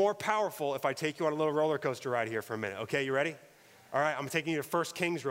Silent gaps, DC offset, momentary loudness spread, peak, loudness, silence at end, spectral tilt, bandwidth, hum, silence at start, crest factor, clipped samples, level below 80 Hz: none; under 0.1%; 6 LU; -14 dBFS; -32 LUFS; 0 s; -4.5 dB/octave; 16 kHz; none; 0 s; 18 dB; under 0.1%; -78 dBFS